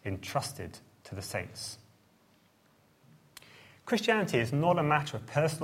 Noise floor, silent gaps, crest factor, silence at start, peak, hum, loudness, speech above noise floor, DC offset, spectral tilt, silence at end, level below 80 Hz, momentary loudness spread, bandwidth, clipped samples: -66 dBFS; none; 22 dB; 0.05 s; -12 dBFS; none; -31 LUFS; 35 dB; under 0.1%; -5 dB/octave; 0 s; -66 dBFS; 22 LU; 16.5 kHz; under 0.1%